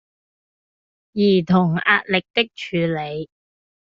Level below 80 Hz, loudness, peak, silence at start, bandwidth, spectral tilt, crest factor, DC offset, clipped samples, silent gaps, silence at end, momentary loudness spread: -60 dBFS; -19 LUFS; -2 dBFS; 1.15 s; 7.2 kHz; -4 dB/octave; 20 dB; under 0.1%; under 0.1%; 2.30-2.34 s; 0.7 s; 14 LU